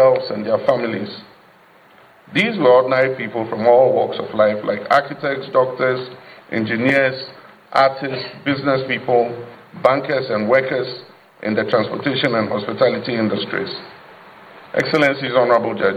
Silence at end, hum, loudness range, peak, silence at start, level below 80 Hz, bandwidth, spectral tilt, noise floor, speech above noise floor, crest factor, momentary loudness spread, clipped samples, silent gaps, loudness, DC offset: 0 s; none; 4 LU; 0 dBFS; 0 s; -64 dBFS; 8.8 kHz; -6.5 dB/octave; -49 dBFS; 31 dB; 18 dB; 12 LU; under 0.1%; none; -18 LUFS; under 0.1%